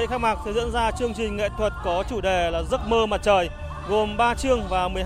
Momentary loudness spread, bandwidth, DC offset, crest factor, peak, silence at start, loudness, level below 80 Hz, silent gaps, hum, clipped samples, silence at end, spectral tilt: 5 LU; 15 kHz; under 0.1%; 16 dB; -6 dBFS; 0 s; -24 LUFS; -34 dBFS; none; none; under 0.1%; 0 s; -5 dB/octave